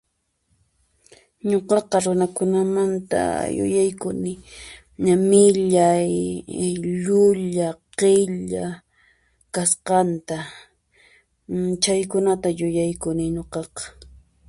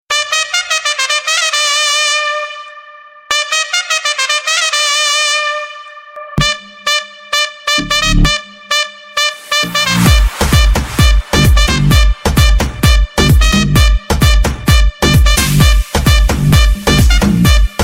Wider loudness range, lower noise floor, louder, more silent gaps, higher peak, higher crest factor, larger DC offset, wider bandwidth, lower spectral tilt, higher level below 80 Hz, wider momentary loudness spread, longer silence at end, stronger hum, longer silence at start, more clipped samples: about the same, 5 LU vs 3 LU; first, -70 dBFS vs -36 dBFS; second, -21 LUFS vs -11 LUFS; neither; about the same, -2 dBFS vs 0 dBFS; first, 18 dB vs 12 dB; neither; second, 11.5 kHz vs 16.5 kHz; first, -5 dB/octave vs -3.5 dB/octave; second, -52 dBFS vs -14 dBFS; first, 14 LU vs 6 LU; first, 0.45 s vs 0 s; neither; first, 1.45 s vs 0.1 s; neither